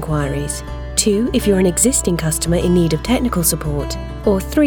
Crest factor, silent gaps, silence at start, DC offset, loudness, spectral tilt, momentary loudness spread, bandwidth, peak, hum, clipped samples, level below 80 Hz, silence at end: 16 dB; none; 0 s; under 0.1%; -17 LUFS; -4.5 dB/octave; 9 LU; over 20 kHz; 0 dBFS; none; under 0.1%; -28 dBFS; 0 s